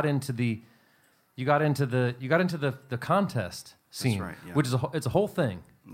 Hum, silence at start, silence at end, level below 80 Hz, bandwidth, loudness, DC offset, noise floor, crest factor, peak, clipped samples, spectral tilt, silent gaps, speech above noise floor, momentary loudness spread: none; 0 s; 0 s; -62 dBFS; 16 kHz; -28 LUFS; under 0.1%; -65 dBFS; 20 dB; -8 dBFS; under 0.1%; -6.5 dB/octave; none; 37 dB; 12 LU